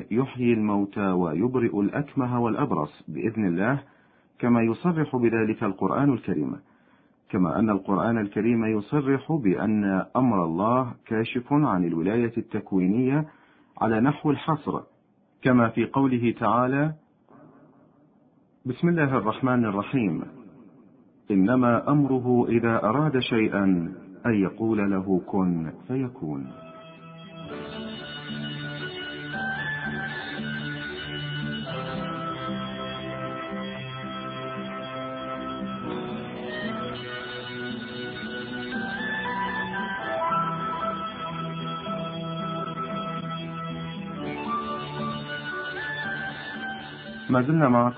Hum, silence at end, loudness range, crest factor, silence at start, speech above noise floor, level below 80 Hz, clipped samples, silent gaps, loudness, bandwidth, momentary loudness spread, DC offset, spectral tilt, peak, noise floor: none; 0 s; 9 LU; 20 dB; 0 s; 39 dB; -56 dBFS; under 0.1%; none; -26 LUFS; 5 kHz; 11 LU; under 0.1%; -11.5 dB/octave; -6 dBFS; -63 dBFS